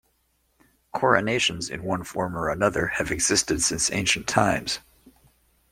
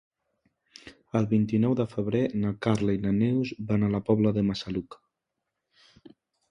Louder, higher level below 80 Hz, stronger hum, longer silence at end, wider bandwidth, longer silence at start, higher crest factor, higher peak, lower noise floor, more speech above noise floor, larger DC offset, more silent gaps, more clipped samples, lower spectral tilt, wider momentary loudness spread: first, -23 LUFS vs -27 LUFS; first, -48 dBFS vs -54 dBFS; neither; second, 0.9 s vs 1.55 s; first, 16.5 kHz vs 10 kHz; about the same, 0.95 s vs 0.85 s; about the same, 22 dB vs 20 dB; first, -4 dBFS vs -8 dBFS; second, -69 dBFS vs -84 dBFS; second, 45 dB vs 58 dB; neither; neither; neither; second, -2.5 dB/octave vs -8 dB/octave; about the same, 9 LU vs 7 LU